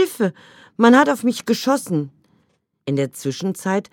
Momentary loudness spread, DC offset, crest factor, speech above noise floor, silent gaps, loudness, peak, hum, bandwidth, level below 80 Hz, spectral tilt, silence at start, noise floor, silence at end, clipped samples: 12 LU; under 0.1%; 18 dB; 47 dB; none; -19 LUFS; 0 dBFS; none; 17.5 kHz; -70 dBFS; -5.5 dB/octave; 0 s; -65 dBFS; 0.1 s; under 0.1%